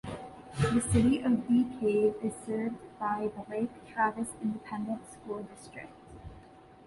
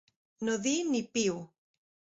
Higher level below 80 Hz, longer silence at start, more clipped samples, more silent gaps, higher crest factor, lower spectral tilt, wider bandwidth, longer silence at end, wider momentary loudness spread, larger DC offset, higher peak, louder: first, -52 dBFS vs -72 dBFS; second, 0.05 s vs 0.4 s; neither; neither; about the same, 18 dB vs 18 dB; first, -6.5 dB/octave vs -3.5 dB/octave; first, 11.5 kHz vs 8 kHz; second, 0.25 s vs 0.7 s; first, 20 LU vs 7 LU; neither; about the same, -14 dBFS vs -16 dBFS; about the same, -31 LUFS vs -31 LUFS